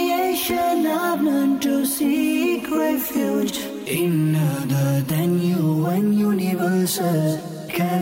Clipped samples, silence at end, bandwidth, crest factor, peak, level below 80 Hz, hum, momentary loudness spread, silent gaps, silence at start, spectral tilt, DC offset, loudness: under 0.1%; 0 s; 16.5 kHz; 8 dB; -12 dBFS; -58 dBFS; none; 3 LU; none; 0 s; -6 dB/octave; under 0.1%; -21 LUFS